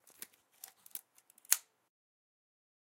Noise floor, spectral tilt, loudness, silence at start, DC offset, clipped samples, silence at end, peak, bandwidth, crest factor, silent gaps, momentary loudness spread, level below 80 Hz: -65 dBFS; 4 dB/octave; -36 LUFS; 0.95 s; under 0.1%; under 0.1%; 1.25 s; -6 dBFS; 17 kHz; 40 dB; none; 21 LU; under -90 dBFS